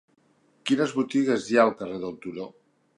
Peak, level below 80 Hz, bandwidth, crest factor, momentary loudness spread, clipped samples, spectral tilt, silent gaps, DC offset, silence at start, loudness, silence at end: -6 dBFS; -70 dBFS; 11 kHz; 20 dB; 15 LU; under 0.1%; -5 dB/octave; none; under 0.1%; 0.65 s; -25 LUFS; 0.5 s